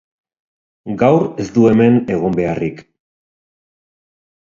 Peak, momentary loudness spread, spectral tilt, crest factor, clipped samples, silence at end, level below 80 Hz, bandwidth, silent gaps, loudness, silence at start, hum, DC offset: 0 dBFS; 13 LU; -8.5 dB/octave; 18 dB; under 0.1%; 1.7 s; -48 dBFS; 7.4 kHz; none; -15 LUFS; 0.85 s; none; under 0.1%